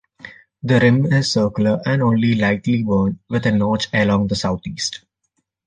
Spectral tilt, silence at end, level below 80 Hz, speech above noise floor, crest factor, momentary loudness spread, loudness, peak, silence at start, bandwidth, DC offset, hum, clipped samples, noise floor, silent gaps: -6 dB/octave; 0.7 s; -46 dBFS; 54 dB; 16 dB; 9 LU; -18 LUFS; -2 dBFS; 0.25 s; 9.6 kHz; under 0.1%; none; under 0.1%; -71 dBFS; none